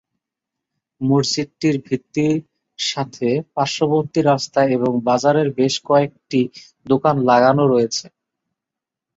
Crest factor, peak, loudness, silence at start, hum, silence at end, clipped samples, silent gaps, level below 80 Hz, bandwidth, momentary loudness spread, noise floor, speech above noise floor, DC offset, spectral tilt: 16 dB; -2 dBFS; -18 LUFS; 1 s; none; 1.1 s; under 0.1%; none; -60 dBFS; 8 kHz; 8 LU; -85 dBFS; 68 dB; under 0.1%; -5.5 dB/octave